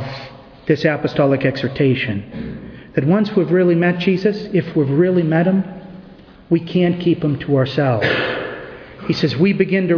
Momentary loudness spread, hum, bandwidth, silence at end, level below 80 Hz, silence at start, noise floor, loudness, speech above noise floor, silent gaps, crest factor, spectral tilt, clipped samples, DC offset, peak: 15 LU; none; 5.4 kHz; 0 s; -48 dBFS; 0 s; -41 dBFS; -17 LUFS; 25 dB; none; 16 dB; -8.5 dB/octave; under 0.1%; under 0.1%; 0 dBFS